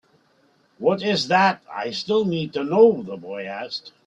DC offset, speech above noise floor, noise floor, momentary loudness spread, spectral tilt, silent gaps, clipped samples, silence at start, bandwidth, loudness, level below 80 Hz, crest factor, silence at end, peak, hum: under 0.1%; 40 dB; -61 dBFS; 15 LU; -5.5 dB/octave; none; under 0.1%; 0.8 s; 8.2 kHz; -21 LUFS; -66 dBFS; 18 dB; 0.15 s; -4 dBFS; none